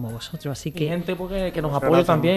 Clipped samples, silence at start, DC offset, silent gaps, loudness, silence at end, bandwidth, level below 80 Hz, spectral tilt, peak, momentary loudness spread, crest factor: under 0.1%; 0 s; under 0.1%; none; -23 LUFS; 0 s; 14.5 kHz; -42 dBFS; -6.5 dB/octave; -4 dBFS; 13 LU; 18 dB